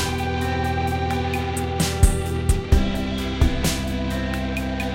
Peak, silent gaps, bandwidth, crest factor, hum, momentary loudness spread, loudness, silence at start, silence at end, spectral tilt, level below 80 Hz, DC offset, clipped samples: -2 dBFS; none; 16.5 kHz; 20 dB; none; 5 LU; -23 LUFS; 0 s; 0 s; -5 dB/octave; -26 dBFS; under 0.1%; under 0.1%